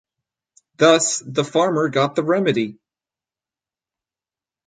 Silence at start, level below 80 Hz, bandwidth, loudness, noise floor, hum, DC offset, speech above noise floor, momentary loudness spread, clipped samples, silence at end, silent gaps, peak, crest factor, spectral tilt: 0.8 s; -68 dBFS; 9.6 kHz; -18 LUFS; under -90 dBFS; none; under 0.1%; over 72 dB; 8 LU; under 0.1%; 1.95 s; none; -2 dBFS; 20 dB; -4 dB/octave